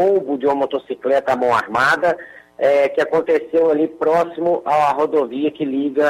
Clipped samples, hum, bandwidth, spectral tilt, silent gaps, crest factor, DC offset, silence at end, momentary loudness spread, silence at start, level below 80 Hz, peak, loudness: under 0.1%; none; 13.5 kHz; -5.5 dB/octave; none; 12 dB; under 0.1%; 0 s; 6 LU; 0 s; -60 dBFS; -6 dBFS; -18 LUFS